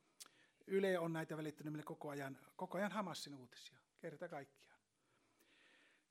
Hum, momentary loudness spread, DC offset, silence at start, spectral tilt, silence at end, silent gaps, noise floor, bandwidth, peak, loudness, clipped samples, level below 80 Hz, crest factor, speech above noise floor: none; 21 LU; under 0.1%; 0.2 s; -5.5 dB/octave; 1.45 s; none; -81 dBFS; 16 kHz; -26 dBFS; -46 LUFS; under 0.1%; under -90 dBFS; 20 dB; 36 dB